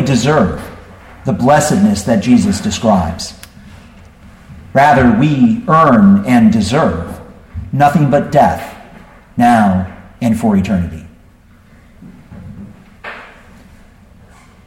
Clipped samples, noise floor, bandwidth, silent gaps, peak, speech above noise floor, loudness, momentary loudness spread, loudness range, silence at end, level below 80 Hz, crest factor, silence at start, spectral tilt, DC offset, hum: under 0.1%; -44 dBFS; 16 kHz; none; 0 dBFS; 33 dB; -12 LUFS; 21 LU; 9 LU; 1.4 s; -38 dBFS; 14 dB; 0 s; -6.5 dB/octave; under 0.1%; none